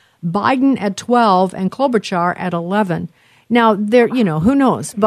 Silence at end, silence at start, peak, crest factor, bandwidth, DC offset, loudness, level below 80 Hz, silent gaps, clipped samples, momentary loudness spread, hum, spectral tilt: 0 s; 0.25 s; 0 dBFS; 14 dB; 13.5 kHz; under 0.1%; -15 LUFS; -50 dBFS; none; under 0.1%; 7 LU; none; -6 dB/octave